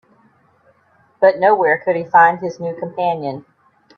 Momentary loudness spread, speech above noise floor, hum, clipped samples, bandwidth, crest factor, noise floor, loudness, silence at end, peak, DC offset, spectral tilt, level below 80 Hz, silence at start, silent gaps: 13 LU; 41 dB; none; under 0.1%; 6.6 kHz; 18 dB; -56 dBFS; -16 LUFS; 0.55 s; 0 dBFS; under 0.1%; -7 dB/octave; -66 dBFS; 1.2 s; none